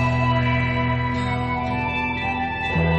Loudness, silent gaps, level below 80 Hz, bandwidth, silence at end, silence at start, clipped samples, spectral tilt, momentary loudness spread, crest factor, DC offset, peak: -22 LUFS; none; -34 dBFS; 8.4 kHz; 0 s; 0 s; under 0.1%; -7.5 dB/octave; 4 LU; 14 dB; under 0.1%; -8 dBFS